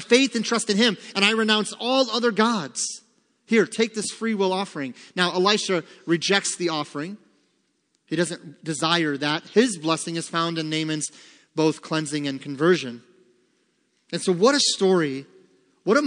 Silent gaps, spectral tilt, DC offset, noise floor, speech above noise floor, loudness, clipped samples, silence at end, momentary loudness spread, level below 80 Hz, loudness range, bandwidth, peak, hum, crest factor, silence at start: none; -3.5 dB/octave; under 0.1%; -70 dBFS; 47 dB; -23 LUFS; under 0.1%; 0 s; 12 LU; -78 dBFS; 4 LU; 10.5 kHz; -4 dBFS; none; 20 dB; 0 s